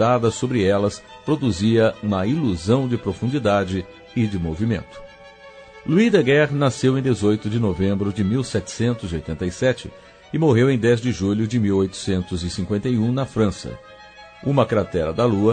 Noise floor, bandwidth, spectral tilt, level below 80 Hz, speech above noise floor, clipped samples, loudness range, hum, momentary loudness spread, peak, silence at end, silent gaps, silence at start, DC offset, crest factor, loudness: -44 dBFS; 9.4 kHz; -6.5 dB/octave; -44 dBFS; 24 dB; under 0.1%; 3 LU; none; 11 LU; -2 dBFS; 0 s; none; 0 s; under 0.1%; 18 dB; -21 LUFS